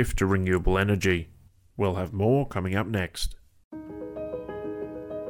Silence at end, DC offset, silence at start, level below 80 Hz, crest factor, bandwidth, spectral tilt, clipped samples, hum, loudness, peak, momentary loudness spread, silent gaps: 0 s; under 0.1%; 0 s; -38 dBFS; 16 dB; 16.5 kHz; -6 dB/octave; under 0.1%; none; -27 LUFS; -10 dBFS; 16 LU; 3.64-3.71 s